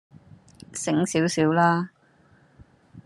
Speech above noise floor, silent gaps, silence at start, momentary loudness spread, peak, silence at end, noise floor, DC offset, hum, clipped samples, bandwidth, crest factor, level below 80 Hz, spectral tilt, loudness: 37 dB; none; 0.75 s; 15 LU; -6 dBFS; 0.05 s; -59 dBFS; under 0.1%; none; under 0.1%; 12.5 kHz; 20 dB; -64 dBFS; -5 dB/octave; -23 LUFS